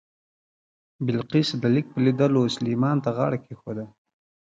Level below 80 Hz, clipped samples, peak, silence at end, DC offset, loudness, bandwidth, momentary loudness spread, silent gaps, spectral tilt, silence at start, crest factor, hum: -64 dBFS; under 0.1%; -8 dBFS; 0.6 s; under 0.1%; -24 LUFS; 7.8 kHz; 14 LU; none; -7 dB/octave; 1 s; 16 dB; none